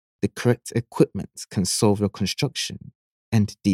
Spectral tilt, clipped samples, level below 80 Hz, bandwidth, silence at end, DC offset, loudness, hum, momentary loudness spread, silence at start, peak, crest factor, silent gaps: -5 dB/octave; under 0.1%; -56 dBFS; 16 kHz; 0 s; under 0.1%; -24 LUFS; none; 9 LU; 0.25 s; -4 dBFS; 20 dB; 2.95-3.32 s